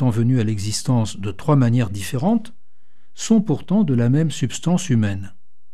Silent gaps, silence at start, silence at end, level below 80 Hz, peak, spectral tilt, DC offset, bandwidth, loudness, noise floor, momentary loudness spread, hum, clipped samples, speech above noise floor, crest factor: none; 0 s; 0.45 s; -54 dBFS; -4 dBFS; -6.5 dB/octave; 3%; 14 kHz; -20 LUFS; -68 dBFS; 8 LU; none; under 0.1%; 49 dB; 16 dB